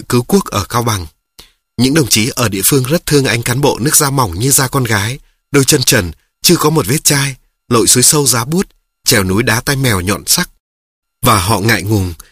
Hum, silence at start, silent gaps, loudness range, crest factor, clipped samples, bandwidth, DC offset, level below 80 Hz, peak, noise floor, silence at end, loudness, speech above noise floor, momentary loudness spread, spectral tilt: none; 0 s; 10.60-11.02 s; 3 LU; 12 dB; 0.1%; over 20 kHz; under 0.1%; -38 dBFS; 0 dBFS; -44 dBFS; 0.15 s; -12 LUFS; 32 dB; 8 LU; -3.5 dB/octave